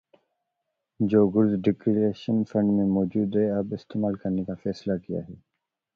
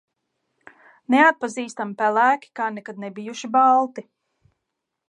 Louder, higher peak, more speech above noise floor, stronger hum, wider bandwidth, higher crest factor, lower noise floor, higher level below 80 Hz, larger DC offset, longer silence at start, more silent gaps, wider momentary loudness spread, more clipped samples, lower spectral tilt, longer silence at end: second, -25 LUFS vs -20 LUFS; second, -8 dBFS vs -4 dBFS; about the same, 57 dB vs 60 dB; neither; second, 6.6 kHz vs 10.5 kHz; about the same, 18 dB vs 18 dB; about the same, -81 dBFS vs -81 dBFS; first, -58 dBFS vs -80 dBFS; neither; about the same, 1 s vs 1.1 s; neither; second, 10 LU vs 17 LU; neither; first, -9.5 dB/octave vs -4 dB/octave; second, 0.6 s vs 1.1 s